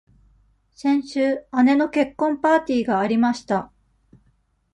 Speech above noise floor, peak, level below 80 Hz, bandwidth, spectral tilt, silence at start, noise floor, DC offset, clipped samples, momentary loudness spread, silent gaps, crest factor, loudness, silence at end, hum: 44 dB; -6 dBFS; -58 dBFS; 10.5 kHz; -6 dB/octave; 0.8 s; -64 dBFS; under 0.1%; under 0.1%; 7 LU; none; 16 dB; -21 LUFS; 1.1 s; none